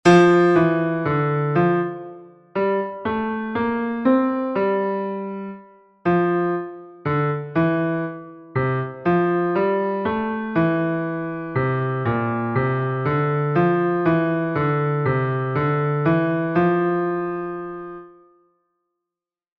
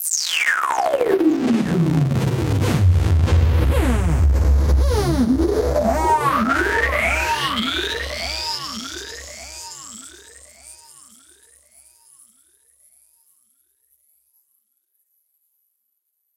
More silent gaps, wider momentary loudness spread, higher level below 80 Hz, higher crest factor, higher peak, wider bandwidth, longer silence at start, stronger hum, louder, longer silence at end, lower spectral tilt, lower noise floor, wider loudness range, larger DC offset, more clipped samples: neither; second, 10 LU vs 16 LU; second, -54 dBFS vs -26 dBFS; about the same, 18 dB vs 16 dB; about the same, -4 dBFS vs -4 dBFS; second, 8.2 kHz vs 17 kHz; about the same, 0.05 s vs 0 s; neither; about the same, -21 LUFS vs -19 LUFS; second, 1.5 s vs 5.6 s; first, -8 dB/octave vs -5 dB/octave; first, -88 dBFS vs -73 dBFS; second, 3 LU vs 17 LU; neither; neither